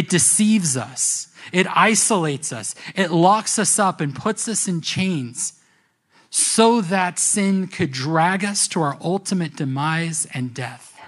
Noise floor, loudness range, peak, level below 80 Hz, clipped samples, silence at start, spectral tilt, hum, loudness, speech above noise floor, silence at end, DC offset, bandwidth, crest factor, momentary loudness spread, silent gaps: -62 dBFS; 3 LU; 0 dBFS; -64 dBFS; under 0.1%; 0 s; -3.5 dB/octave; none; -19 LUFS; 42 dB; 0 s; under 0.1%; 13.5 kHz; 20 dB; 11 LU; none